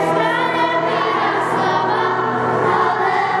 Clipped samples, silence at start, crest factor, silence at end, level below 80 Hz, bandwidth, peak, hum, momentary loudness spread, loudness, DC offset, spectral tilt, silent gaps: under 0.1%; 0 s; 12 dB; 0 s; -58 dBFS; 12 kHz; -4 dBFS; none; 2 LU; -17 LUFS; under 0.1%; -5.5 dB/octave; none